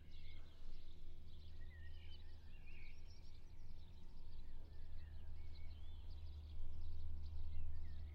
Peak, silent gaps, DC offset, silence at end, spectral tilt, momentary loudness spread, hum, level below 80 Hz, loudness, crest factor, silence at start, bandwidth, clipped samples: -32 dBFS; none; under 0.1%; 0 s; -6.5 dB/octave; 9 LU; none; -50 dBFS; -58 LUFS; 14 dB; 0 s; 5.6 kHz; under 0.1%